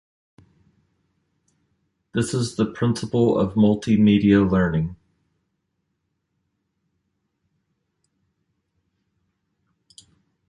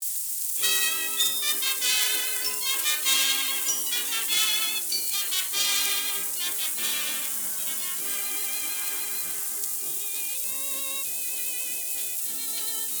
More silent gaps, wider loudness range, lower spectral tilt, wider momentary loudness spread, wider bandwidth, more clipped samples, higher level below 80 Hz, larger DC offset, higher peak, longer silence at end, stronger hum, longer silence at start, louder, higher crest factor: neither; first, 9 LU vs 4 LU; first, -7 dB/octave vs 3 dB/octave; first, 10 LU vs 6 LU; second, 11.5 kHz vs over 20 kHz; neither; first, -48 dBFS vs -78 dBFS; neither; about the same, -4 dBFS vs -6 dBFS; first, 5.55 s vs 0 s; neither; first, 2.15 s vs 0 s; first, -20 LUFS vs -24 LUFS; about the same, 20 dB vs 22 dB